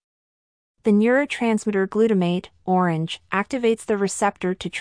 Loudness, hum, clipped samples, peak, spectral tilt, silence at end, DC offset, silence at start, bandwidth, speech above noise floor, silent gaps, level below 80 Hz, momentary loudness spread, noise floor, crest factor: -22 LUFS; none; under 0.1%; -6 dBFS; -5.5 dB/octave; 0 s; under 0.1%; 0.85 s; 10.5 kHz; over 69 dB; none; -60 dBFS; 7 LU; under -90 dBFS; 16 dB